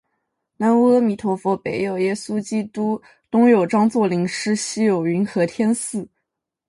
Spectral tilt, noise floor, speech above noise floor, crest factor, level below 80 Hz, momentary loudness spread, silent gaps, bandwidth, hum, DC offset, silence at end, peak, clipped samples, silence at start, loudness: -5.5 dB/octave; -79 dBFS; 60 dB; 16 dB; -64 dBFS; 9 LU; none; 11.5 kHz; none; under 0.1%; 0.65 s; -4 dBFS; under 0.1%; 0.6 s; -20 LUFS